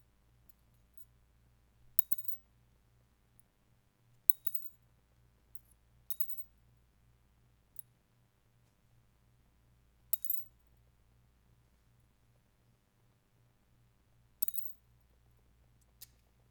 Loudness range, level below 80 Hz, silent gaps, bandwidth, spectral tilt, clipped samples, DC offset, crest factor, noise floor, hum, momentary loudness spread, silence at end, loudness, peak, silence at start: 9 LU; -72 dBFS; none; over 20 kHz; -2 dB/octave; under 0.1%; under 0.1%; 40 dB; -72 dBFS; none; 23 LU; 1.8 s; -33 LUFS; -2 dBFS; 0.95 s